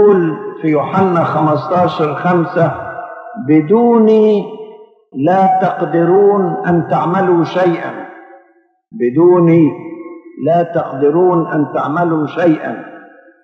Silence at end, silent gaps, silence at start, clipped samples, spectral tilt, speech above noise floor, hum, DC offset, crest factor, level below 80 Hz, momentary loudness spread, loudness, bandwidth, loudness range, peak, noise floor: 0.45 s; none; 0 s; under 0.1%; -9.5 dB/octave; 41 dB; none; under 0.1%; 12 dB; -62 dBFS; 17 LU; -13 LUFS; 6.4 kHz; 3 LU; 0 dBFS; -53 dBFS